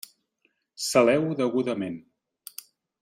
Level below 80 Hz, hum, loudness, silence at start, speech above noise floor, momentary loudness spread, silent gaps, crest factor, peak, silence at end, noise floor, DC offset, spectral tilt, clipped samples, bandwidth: -68 dBFS; none; -25 LUFS; 0.8 s; 48 dB; 23 LU; none; 20 dB; -6 dBFS; 1.05 s; -72 dBFS; under 0.1%; -4.5 dB/octave; under 0.1%; 16 kHz